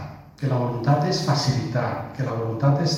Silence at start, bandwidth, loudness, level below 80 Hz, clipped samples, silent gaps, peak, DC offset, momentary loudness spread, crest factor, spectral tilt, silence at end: 0 s; 11 kHz; -23 LUFS; -52 dBFS; under 0.1%; none; -8 dBFS; under 0.1%; 8 LU; 16 dB; -6 dB/octave; 0 s